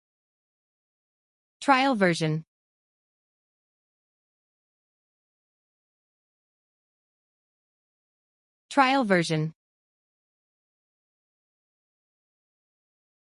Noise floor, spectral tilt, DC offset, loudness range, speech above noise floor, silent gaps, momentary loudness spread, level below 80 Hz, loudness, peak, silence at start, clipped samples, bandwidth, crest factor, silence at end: under -90 dBFS; -5.5 dB/octave; under 0.1%; 8 LU; over 67 dB; 2.48-8.69 s; 10 LU; -78 dBFS; -24 LUFS; -8 dBFS; 1.6 s; under 0.1%; 11.5 kHz; 24 dB; 3.7 s